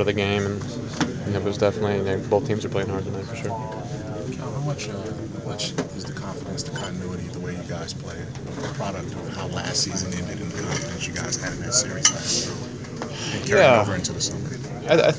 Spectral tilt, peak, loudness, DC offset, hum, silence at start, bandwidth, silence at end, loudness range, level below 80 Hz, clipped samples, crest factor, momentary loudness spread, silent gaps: -4 dB/octave; -2 dBFS; -25 LUFS; under 0.1%; none; 0 s; 8 kHz; 0 s; 9 LU; -46 dBFS; under 0.1%; 24 dB; 12 LU; none